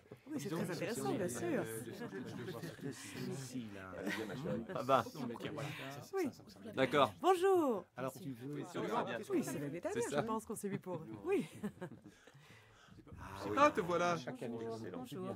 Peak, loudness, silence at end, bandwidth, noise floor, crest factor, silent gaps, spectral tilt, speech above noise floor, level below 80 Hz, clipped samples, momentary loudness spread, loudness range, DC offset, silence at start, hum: -14 dBFS; -39 LUFS; 0 s; 16 kHz; -62 dBFS; 24 dB; none; -5 dB/octave; 23 dB; -74 dBFS; under 0.1%; 14 LU; 7 LU; under 0.1%; 0.1 s; none